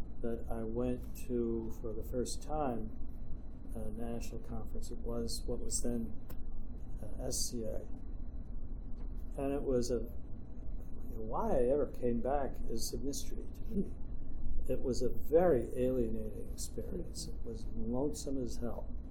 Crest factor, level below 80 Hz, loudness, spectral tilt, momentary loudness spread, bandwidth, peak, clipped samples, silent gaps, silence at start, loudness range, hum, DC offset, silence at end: 18 dB; -40 dBFS; -39 LUFS; -5.5 dB/octave; 15 LU; 15.5 kHz; -18 dBFS; under 0.1%; none; 0 s; 6 LU; none; under 0.1%; 0 s